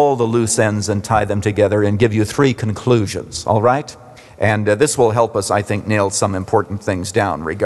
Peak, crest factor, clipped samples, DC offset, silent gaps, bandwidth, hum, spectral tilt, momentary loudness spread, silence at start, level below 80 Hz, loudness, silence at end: -2 dBFS; 14 dB; under 0.1%; under 0.1%; none; 12.5 kHz; none; -5.5 dB/octave; 6 LU; 0 s; -48 dBFS; -17 LUFS; 0 s